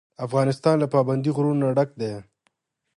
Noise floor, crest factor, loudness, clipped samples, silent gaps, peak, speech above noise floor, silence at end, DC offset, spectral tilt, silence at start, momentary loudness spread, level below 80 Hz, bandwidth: -72 dBFS; 18 dB; -23 LUFS; under 0.1%; none; -6 dBFS; 50 dB; 0.75 s; under 0.1%; -8 dB/octave; 0.2 s; 10 LU; -66 dBFS; 11.5 kHz